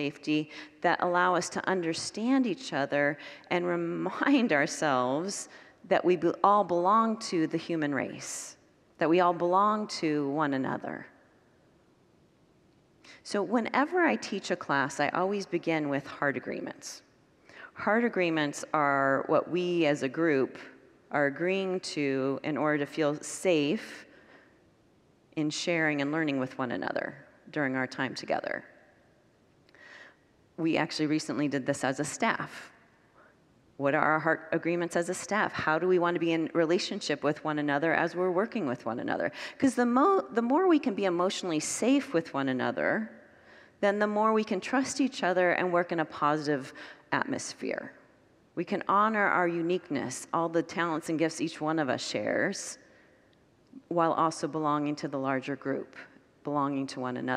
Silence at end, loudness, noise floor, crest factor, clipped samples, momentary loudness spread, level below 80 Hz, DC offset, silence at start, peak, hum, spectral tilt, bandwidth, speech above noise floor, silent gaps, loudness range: 0 s; -29 LUFS; -64 dBFS; 22 dB; under 0.1%; 10 LU; -76 dBFS; under 0.1%; 0 s; -8 dBFS; none; -4.5 dB/octave; 13 kHz; 35 dB; none; 5 LU